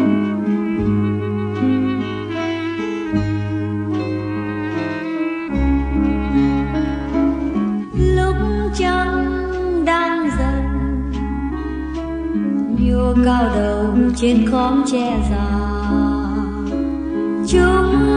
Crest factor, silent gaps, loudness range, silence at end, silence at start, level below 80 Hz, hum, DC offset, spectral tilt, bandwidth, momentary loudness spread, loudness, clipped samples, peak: 16 dB; none; 4 LU; 0 s; 0 s; -26 dBFS; none; under 0.1%; -7 dB/octave; 10 kHz; 8 LU; -19 LUFS; under 0.1%; -2 dBFS